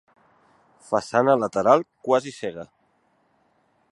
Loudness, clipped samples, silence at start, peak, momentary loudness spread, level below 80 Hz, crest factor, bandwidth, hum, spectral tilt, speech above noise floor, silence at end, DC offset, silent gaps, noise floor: -22 LUFS; under 0.1%; 0.9 s; -2 dBFS; 14 LU; -68 dBFS; 22 dB; 11.5 kHz; none; -5.5 dB/octave; 44 dB; 1.3 s; under 0.1%; none; -66 dBFS